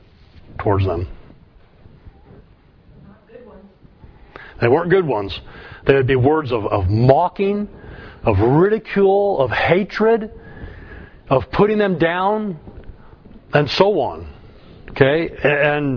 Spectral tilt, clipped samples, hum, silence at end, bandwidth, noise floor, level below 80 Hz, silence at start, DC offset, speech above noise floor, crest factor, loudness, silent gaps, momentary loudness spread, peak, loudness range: -8.5 dB/octave; under 0.1%; none; 0 s; 5.4 kHz; -49 dBFS; -40 dBFS; 0.5 s; under 0.1%; 32 dB; 18 dB; -17 LUFS; none; 22 LU; 0 dBFS; 8 LU